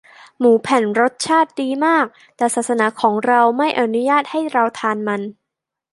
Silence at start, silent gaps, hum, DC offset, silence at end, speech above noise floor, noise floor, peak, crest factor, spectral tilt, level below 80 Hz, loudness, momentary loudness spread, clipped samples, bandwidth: 0.4 s; none; none; under 0.1%; 0.6 s; 65 dB; -82 dBFS; -2 dBFS; 16 dB; -4 dB/octave; -68 dBFS; -17 LUFS; 7 LU; under 0.1%; 11.5 kHz